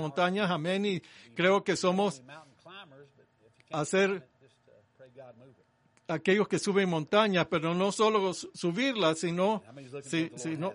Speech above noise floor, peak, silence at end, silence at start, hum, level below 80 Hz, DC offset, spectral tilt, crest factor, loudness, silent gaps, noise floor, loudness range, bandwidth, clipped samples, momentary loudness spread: 38 dB; -10 dBFS; 0 s; 0 s; none; -76 dBFS; under 0.1%; -5 dB/octave; 22 dB; -29 LUFS; none; -67 dBFS; 8 LU; 10.5 kHz; under 0.1%; 17 LU